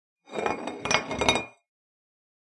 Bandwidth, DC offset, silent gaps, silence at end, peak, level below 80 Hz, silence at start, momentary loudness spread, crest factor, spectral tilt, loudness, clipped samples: 11.5 kHz; under 0.1%; none; 0.95 s; -2 dBFS; -52 dBFS; 0.3 s; 12 LU; 28 dB; -2.5 dB/octave; -27 LUFS; under 0.1%